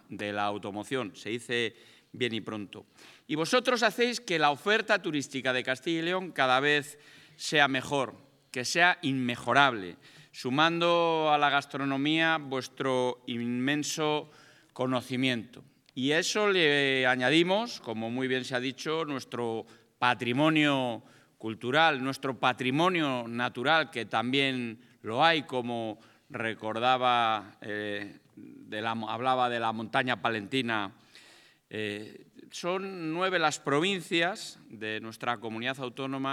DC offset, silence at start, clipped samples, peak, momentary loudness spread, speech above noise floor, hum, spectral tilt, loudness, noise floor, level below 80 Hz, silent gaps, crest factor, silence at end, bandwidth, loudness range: under 0.1%; 0.1 s; under 0.1%; -6 dBFS; 13 LU; 29 dB; none; -4 dB/octave; -28 LUFS; -58 dBFS; -82 dBFS; none; 24 dB; 0 s; 15.5 kHz; 5 LU